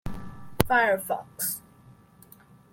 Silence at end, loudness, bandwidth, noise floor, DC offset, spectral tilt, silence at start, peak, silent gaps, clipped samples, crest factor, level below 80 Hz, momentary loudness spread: 0.8 s; -26 LUFS; 17 kHz; -54 dBFS; under 0.1%; -4 dB/octave; 0.05 s; -2 dBFS; none; under 0.1%; 28 dB; -48 dBFS; 19 LU